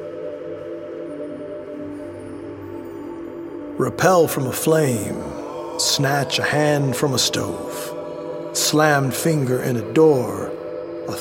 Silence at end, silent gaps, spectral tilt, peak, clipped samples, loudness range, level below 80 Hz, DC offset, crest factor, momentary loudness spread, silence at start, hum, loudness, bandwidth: 0 s; none; -4 dB/octave; -2 dBFS; under 0.1%; 12 LU; -56 dBFS; under 0.1%; 20 dB; 16 LU; 0 s; none; -20 LUFS; 17 kHz